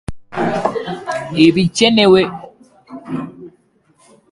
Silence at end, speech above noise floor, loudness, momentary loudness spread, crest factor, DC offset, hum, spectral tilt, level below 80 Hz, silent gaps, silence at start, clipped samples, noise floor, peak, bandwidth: 0.8 s; 44 dB; -15 LUFS; 17 LU; 16 dB; under 0.1%; none; -5 dB/octave; -44 dBFS; none; 0.1 s; under 0.1%; -55 dBFS; 0 dBFS; 11.5 kHz